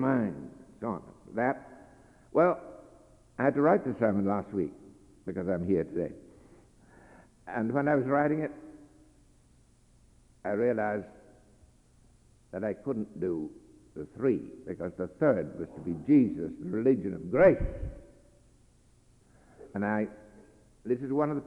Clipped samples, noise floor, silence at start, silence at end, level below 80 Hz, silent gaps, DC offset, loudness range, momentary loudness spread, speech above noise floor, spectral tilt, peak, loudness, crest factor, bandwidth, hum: under 0.1%; -62 dBFS; 0 s; 0 s; -52 dBFS; none; under 0.1%; 8 LU; 19 LU; 33 dB; -9.5 dB/octave; -10 dBFS; -30 LUFS; 22 dB; 10.5 kHz; none